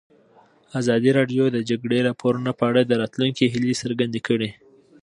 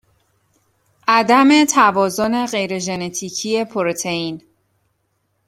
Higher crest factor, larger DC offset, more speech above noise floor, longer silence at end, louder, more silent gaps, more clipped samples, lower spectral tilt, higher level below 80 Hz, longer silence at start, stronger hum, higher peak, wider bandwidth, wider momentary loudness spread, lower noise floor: about the same, 18 dB vs 18 dB; neither; second, 34 dB vs 51 dB; second, 0.5 s vs 1.1 s; second, -22 LUFS vs -17 LUFS; neither; neither; first, -6 dB/octave vs -3.5 dB/octave; about the same, -62 dBFS vs -60 dBFS; second, 0.75 s vs 1.05 s; neither; second, -4 dBFS vs 0 dBFS; second, 11 kHz vs 15.5 kHz; second, 6 LU vs 12 LU; second, -55 dBFS vs -68 dBFS